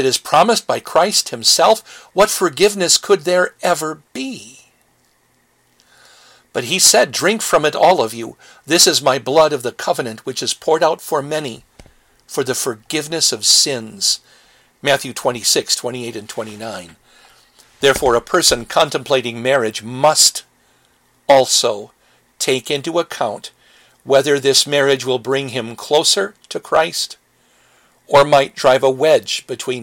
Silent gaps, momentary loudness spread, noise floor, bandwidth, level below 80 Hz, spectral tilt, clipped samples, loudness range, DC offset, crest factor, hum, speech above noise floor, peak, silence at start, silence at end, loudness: none; 15 LU; -59 dBFS; 17 kHz; -52 dBFS; -2 dB/octave; under 0.1%; 5 LU; under 0.1%; 18 dB; none; 43 dB; 0 dBFS; 0 s; 0 s; -15 LUFS